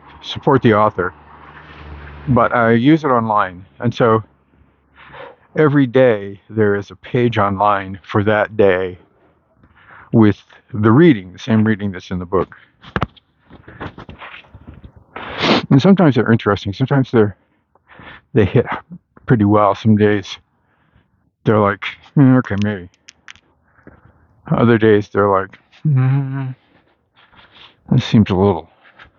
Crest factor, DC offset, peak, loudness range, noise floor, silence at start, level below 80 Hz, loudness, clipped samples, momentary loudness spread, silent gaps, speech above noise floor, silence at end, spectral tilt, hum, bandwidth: 16 dB; under 0.1%; 0 dBFS; 3 LU; -60 dBFS; 0.25 s; -46 dBFS; -15 LUFS; under 0.1%; 17 LU; none; 45 dB; 0.55 s; -8 dB/octave; none; 7 kHz